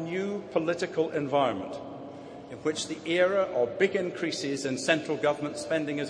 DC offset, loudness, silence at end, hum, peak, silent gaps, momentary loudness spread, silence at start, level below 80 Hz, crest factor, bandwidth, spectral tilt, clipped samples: under 0.1%; -29 LUFS; 0 s; none; -8 dBFS; none; 13 LU; 0 s; -70 dBFS; 22 dB; 10.5 kHz; -4.5 dB/octave; under 0.1%